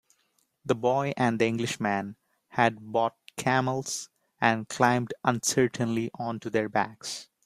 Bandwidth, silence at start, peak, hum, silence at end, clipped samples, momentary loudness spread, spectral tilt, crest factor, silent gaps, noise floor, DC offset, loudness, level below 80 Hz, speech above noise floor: 15 kHz; 0.65 s; -6 dBFS; none; 0.2 s; under 0.1%; 10 LU; -4.5 dB/octave; 22 dB; none; -72 dBFS; under 0.1%; -28 LUFS; -66 dBFS; 45 dB